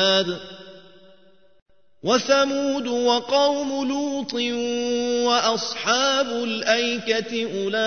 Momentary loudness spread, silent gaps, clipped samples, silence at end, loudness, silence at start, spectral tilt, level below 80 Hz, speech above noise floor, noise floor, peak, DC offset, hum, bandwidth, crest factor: 7 LU; 1.62-1.66 s; under 0.1%; 0 s; -22 LUFS; 0 s; -2.5 dB/octave; -64 dBFS; 35 dB; -56 dBFS; -6 dBFS; 0.3%; none; 6.6 kHz; 18 dB